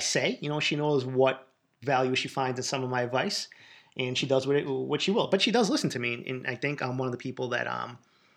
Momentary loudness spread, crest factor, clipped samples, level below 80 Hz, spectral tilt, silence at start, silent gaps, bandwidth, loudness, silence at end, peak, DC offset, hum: 9 LU; 18 dB; under 0.1%; -80 dBFS; -4 dB/octave; 0 s; none; 14 kHz; -28 LUFS; 0.4 s; -10 dBFS; under 0.1%; none